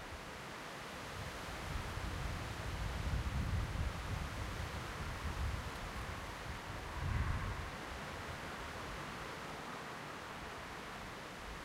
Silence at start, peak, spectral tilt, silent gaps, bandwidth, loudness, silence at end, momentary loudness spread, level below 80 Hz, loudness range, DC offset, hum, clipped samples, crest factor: 0 s; -24 dBFS; -5 dB/octave; none; 16 kHz; -44 LUFS; 0 s; 7 LU; -48 dBFS; 4 LU; under 0.1%; none; under 0.1%; 18 dB